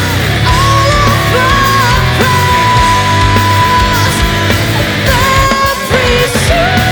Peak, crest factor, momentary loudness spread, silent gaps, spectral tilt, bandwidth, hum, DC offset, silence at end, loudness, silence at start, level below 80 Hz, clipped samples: 0 dBFS; 8 dB; 3 LU; none; -4.5 dB/octave; over 20 kHz; none; under 0.1%; 0 s; -9 LUFS; 0 s; -20 dBFS; under 0.1%